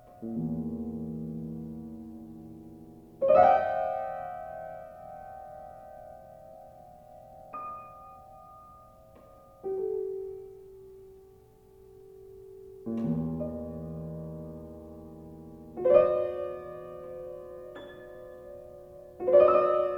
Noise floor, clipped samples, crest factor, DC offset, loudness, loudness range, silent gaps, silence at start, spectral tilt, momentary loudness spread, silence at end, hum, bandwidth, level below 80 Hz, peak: -56 dBFS; under 0.1%; 24 dB; under 0.1%; -29 LUFS; 17 LU; none; 0.05 s; -9 dB/octave; 28 LU; 0 s; 60 Hz at -70 dBFS; 5.4 kHz; -58 dBFS; -8 dBFS